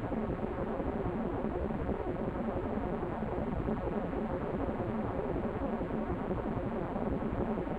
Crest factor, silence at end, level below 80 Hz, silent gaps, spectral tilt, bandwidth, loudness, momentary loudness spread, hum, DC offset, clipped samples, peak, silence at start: 16 dB; 0 s; -44 dBFS; none; -10 dB/octave; 7.8 kHz; -36 LUFS; 1 LU; none; under 0.1%; under 0.1%; -18 dBFS; 0 s